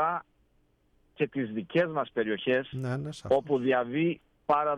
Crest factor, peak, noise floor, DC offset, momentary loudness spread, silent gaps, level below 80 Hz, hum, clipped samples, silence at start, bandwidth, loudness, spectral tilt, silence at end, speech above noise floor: 16 dB; -14 dBFS; -68 dBFS; under 0.1%; 7 LU; none; -64 dBFS; none; under 0.1%; 0 s; 11 kHz; -30 LUFS; -7 dB/octave; 0 s; 40 dB